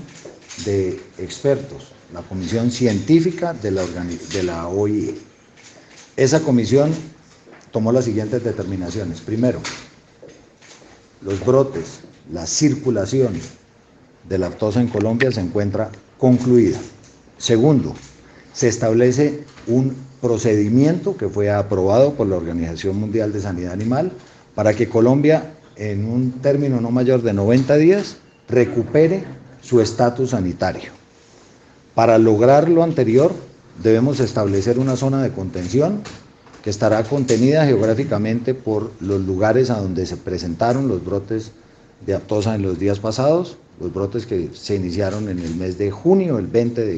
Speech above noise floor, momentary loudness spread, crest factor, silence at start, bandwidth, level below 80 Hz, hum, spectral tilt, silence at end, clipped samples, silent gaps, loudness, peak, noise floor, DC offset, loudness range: 33 dB; 14 LU; 18 dB; 0 s; 8.6 kHz; -50 dBFS; none; -6.5 dB/octave; 0 s; under 0.1%; none; -18 LUFS; -2 dBFS; -50 dBFS; under 0.1%; 5 LU